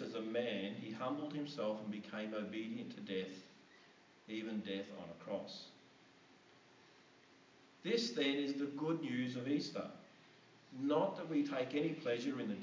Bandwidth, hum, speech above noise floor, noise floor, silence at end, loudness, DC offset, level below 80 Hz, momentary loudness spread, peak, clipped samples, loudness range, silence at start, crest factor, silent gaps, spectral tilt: 7.6 kHz; none; 25 dB; -66 dBFS; 0 s; -41 LUFS; under 0.1%; -88 dBFS; 14 LU; -22 dBFS; under 0.1%; 8 LU; 0 s; 20 dB; none; -5.5 dB/octave